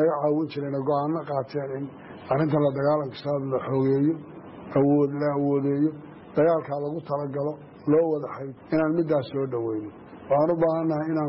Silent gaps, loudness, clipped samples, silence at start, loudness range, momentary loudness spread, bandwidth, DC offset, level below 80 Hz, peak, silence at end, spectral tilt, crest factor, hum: none; -25 LUFS; under 0.1%; 0 s; 2 LU; 12 LU; 5.8 kHz; under 0.1%; -64 dBFS; -12 dBFS; 0 s; -8 dB/octave; 14 dB; none